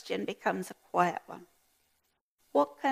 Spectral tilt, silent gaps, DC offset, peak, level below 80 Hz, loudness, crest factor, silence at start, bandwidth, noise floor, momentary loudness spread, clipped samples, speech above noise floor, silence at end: -5 dB/octave; 2.21-2.38 s; under 0.1%; -12 dBFS; -82 dBFS; -32 LUFS; 22 dB; 0.05 s; 15.5 kHz; -77 dBFS; 15 LU; under 0.1%; 46 dB; 0 s